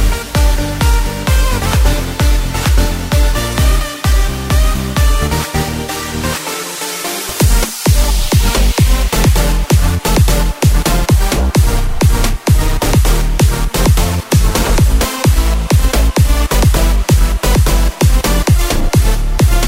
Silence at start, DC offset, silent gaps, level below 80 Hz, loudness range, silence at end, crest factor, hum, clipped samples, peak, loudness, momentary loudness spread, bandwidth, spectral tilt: 0 s; under 0.1%; none; -12 dBFS; 3 LU; 0 s; 10 dB; none; under 0.1%; 0 dBFS; -14 LUFS; 4 LU; 16.5 kHz; -4.5 dB/octave